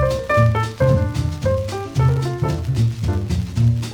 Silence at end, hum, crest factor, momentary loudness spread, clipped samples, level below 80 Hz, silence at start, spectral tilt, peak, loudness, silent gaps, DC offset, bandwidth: 0 s; none; 16 dB; 6 LU; under 0.1%; -34 dBFS; 0 s; -7 dB/octave; -2 dBFS; -19 LUFS; none; under 0.1%; 14 kHz